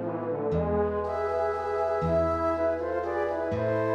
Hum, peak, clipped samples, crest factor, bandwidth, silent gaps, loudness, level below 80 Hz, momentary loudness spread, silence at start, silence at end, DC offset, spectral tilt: none; -16 dBFS; under 0.1%; 12 dB; 8.6 kHz; none; -28 LUFS; -46 dBFS; 4 LU; 0 s; 0 s; under 0.1%; -8.5 dB/octave